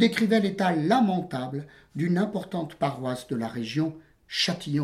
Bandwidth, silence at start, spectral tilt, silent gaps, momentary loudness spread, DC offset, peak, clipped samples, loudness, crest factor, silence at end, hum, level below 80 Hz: 14.5 kHz; 0 s; -6 dB/octave; none; 10 LU; under 0.1%; -8 dBFS; under 0.1%; -27 LUFS; 18 dB; 0 s; none; -64 dBFS